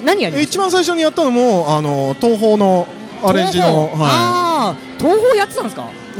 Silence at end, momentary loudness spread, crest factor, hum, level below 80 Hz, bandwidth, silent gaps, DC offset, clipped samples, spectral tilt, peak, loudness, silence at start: 0 s; 7 LU; 14 dB; none; -52 dBFS; 17.5 kHz; none; under 0.1%; under 0.1%; -5 dB/octave; -2 dBFS; -14 LUFS; 0 s